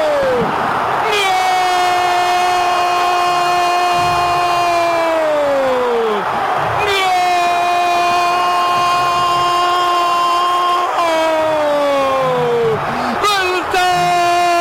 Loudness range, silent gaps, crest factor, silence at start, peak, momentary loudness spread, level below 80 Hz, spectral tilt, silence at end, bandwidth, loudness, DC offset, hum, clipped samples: 1 LU; none; 8 dB; 0 s; -6 dBFS; 2 LU; -46 dBFS; -3 dB/octave; 0 s; 16.5 kHz; -14 LUFS; under 0.1%; none; under 0.1%